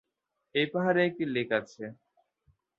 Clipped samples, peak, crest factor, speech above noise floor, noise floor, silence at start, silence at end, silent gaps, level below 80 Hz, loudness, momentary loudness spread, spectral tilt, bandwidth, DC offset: under 0.1%; -12 dBFS; 20 dB; 53 dB; -82 dBFS; 0.55 s; 0.85 s; none; -74 dBFS; -29 LUFS; 17 LU; -6.5 dB/octave; 7.4 kHz; under 0.1%